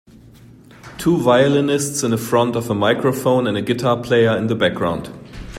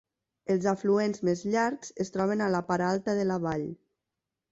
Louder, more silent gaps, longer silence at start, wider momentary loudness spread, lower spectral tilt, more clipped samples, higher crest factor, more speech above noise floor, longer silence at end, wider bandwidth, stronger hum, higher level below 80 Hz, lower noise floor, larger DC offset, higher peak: first, -17 LUFS vs -29 LUFS; neither; first, 0.85 s vs 0.5 s; about the same, 9 LU vs 8 LU; second, -5 dB/octave vs -6.5 dB/octave; neither; about the same, 16 dB vs 16 dB; second, 27 dB vs 59 dB; second, 0 s vs 0.75 s; first, 16 kHz vs 8 kHz; neither; first, -46 dBFS vs -64 dBFS; second, -44 dBFS vs -87 dBFS; neither; first, -2 dBFS vs -14 dBFS